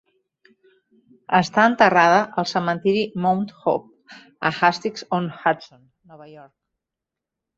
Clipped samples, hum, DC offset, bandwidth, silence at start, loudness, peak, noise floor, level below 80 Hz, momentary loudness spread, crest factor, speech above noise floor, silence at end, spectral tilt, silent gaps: under 0.1%; none; under 0.1%; 8 kHz; 1.3 s; -20 LUFS; -2 dBFS; -86 dBFS; -66 dBFS; 11 LU; 22 dB; 66 dB; 1.15 s; -5.5 dB/octave; none